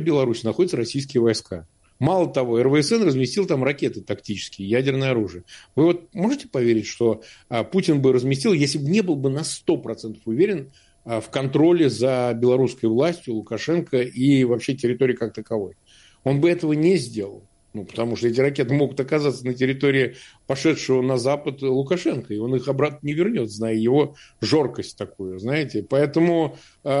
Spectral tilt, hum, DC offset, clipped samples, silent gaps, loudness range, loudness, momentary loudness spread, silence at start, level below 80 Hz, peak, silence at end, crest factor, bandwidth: -6 dB/octave; none; under 0.1%; under 0.1%; none; 2 LU; -22 LUFS; 11 LU; 0 s; -60 dBFS; -6 dBFS; 0 s; 16 dB; 11.5 kHz